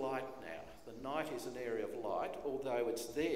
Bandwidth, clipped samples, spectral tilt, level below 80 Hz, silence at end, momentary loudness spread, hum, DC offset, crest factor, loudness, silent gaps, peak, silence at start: 16 kHz; under 0.1%; -4.5 dB/octave; -68 dBFS; 0 s; 11 LU; none; 0.1%; 16 dB; -41 LUFS; none; -24 dBFS; 0 s